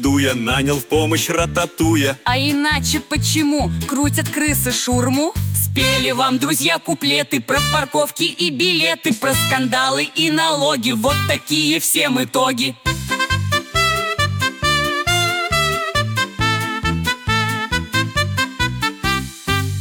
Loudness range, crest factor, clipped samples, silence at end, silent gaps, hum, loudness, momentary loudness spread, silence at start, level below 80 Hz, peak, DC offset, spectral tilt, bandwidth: 2 LU; 14 dB; under 0.1%; 0 s; none; none; -17 LUFS; 4 LU; 0 s; -36 dBFS; -4 dBFS; under 0.1%; -3.5 dB/octave; 19.5 kHz